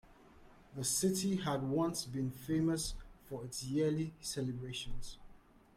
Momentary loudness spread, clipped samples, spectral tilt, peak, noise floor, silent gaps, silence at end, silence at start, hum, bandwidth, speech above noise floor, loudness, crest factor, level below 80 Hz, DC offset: 14 LU; under 0.1%; -4.5 dB/octave; -22 dBFS; -60 dBFS; none; 0.4 s; 0.05 s; none; 16.5 kHz; 24 dB; -37 LUFS; 16 dB; -54 dBFS; under 0.1%